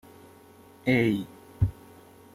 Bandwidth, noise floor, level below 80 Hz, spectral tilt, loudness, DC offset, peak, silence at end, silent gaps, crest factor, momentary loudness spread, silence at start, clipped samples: 15.5 kHz; -53 dBFS; -46 dBFS; -7.5 dB/octave; -27 LUFS; under 0.1%; -10 dBFS; 0.65 s; none; 20 dB; 9 LU; 0.85 s; under 0.1%